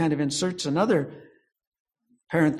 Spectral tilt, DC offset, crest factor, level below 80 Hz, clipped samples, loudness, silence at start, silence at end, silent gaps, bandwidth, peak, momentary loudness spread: -5 dB/octave; under 0.1%; 18 dB; -64 dBFS; under 0.1%; -25 LUFS; 0 s; 0 s; 1.67-1.72 s, 1.80-1.85 s; 12.5 kHz; -8 dBFS; 6 LU